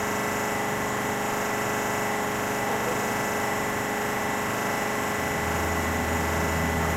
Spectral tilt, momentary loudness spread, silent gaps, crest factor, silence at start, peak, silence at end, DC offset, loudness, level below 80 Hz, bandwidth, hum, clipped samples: -4 dB/octave; 2 LU; none; 12 dB; 0 s; -14 dBFS; 0 s; under 0.1%; -26 LUFS; -46 dBFS; 16.5 kHz; 50 Hz at -65 dBFS; under 0.1%